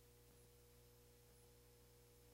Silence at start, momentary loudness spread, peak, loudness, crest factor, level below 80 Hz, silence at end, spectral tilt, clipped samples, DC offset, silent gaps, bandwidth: 0 s; 0 LU; -56 dBFS; -69 LUFS; 12 dB; -74 dBFS; 0 s; -4 dB/octave; under 0.1%; under 0.1%; none; 16 kHz